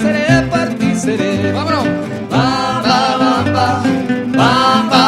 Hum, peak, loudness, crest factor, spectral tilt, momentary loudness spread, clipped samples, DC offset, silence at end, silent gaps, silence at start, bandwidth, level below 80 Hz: none; 0 dBFS; -14 LUFS; 14 dB; -5.5 dB/octave; 5 LU; under 0.1%; under 0.1%; 0 s; none; 0 s; 13.5 kHz; -42 dBFS